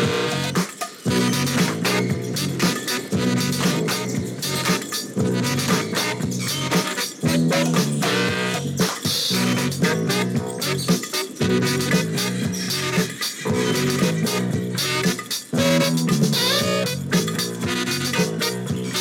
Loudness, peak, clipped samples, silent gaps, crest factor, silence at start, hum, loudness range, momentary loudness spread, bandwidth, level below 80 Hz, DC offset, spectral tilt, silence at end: -21 LUFS; -8 dBFS; under 0.1%; none; 14 dB; 0 s; none; 2 LU; 5 LU; 18.5 kHz; -54 dBFS; under 0.1%; -4 dB/octave; 0 s